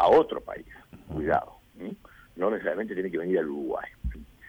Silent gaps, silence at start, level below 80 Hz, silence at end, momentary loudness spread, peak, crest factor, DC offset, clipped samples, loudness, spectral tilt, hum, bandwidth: none; 0 s; -46 dBFS; 0 s; 19 LU; -12 dBFS; 18 dB; under 0.1%; under 0.1%; -29 LUFS; -7.5 dB/octave; none; 19.5 kHz